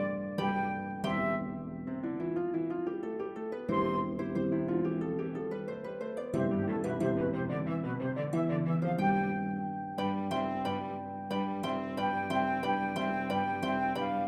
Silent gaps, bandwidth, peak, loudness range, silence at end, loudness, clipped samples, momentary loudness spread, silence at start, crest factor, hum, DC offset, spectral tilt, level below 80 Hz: none; 12.5 kHz; -18 dBFS; 2 LU; 0 s; -33 LUFS; under 0.1%; 7 LU; 0 s; 16 dB; none; under 0.1%; -7.5 dB/octave; -64 dBFS